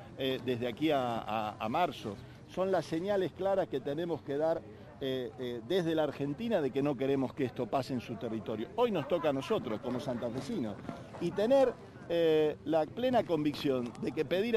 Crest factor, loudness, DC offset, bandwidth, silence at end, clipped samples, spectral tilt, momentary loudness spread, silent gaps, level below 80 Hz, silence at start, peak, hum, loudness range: 16 dB; -33 LUFS; under 0.1%; 15 kHz; 0 s; under 0.1%; -6.5 dB/octave; 9 LU; none; -64 dBFS; 0 s; -16 dBFS; none; 3 LU